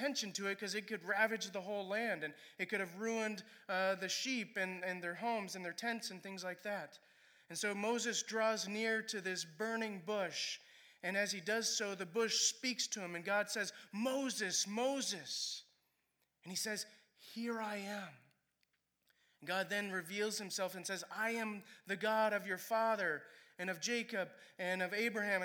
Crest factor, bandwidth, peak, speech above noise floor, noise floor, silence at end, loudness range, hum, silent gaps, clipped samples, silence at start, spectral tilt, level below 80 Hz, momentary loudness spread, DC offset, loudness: 20 dB; over 20 kHz; -20 dBFS; 43 dB; -83 dBFS; 0 s; 6 LU; none; none; under 0.1%; 0 s; -2 dB/octave; under -90 dBFS; 9 LU; under 0.1%; -39 LUFS